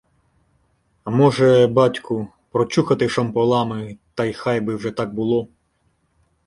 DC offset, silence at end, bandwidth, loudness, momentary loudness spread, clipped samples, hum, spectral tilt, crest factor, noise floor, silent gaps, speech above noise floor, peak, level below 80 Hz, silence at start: under 0.1%; 1 s; 11.5 kHz; -19 LUFS; 13 LU; under 0.1%; none; -7 dB/octave; 18 dB; -65 dBFS; none; 47 dB; -2 dBFS; -56 dBFS; 1.05 s